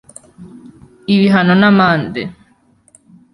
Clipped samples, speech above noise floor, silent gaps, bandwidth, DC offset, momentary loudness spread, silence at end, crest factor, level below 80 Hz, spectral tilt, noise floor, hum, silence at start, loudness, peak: under 0.1%; 42 dB; none; 11.5 kHz; under 0.1%; 17 LU; 1 s; 14 dB; -52 dBFS; -7 dB/octave; -53 dBFS; none; 0.4 s; -12 LUFS; -2 dBFS